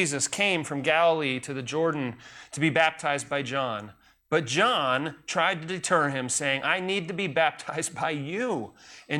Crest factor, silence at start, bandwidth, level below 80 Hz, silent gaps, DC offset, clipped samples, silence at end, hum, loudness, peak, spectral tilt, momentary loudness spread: 18 dB; 0 s; 17.5 kHz; -68 dBFS; none; under 0.1%; under 0.1%; 0 s; none; -26 LUFS; -8 dBFS; -3.5 dB/octave; 9 LU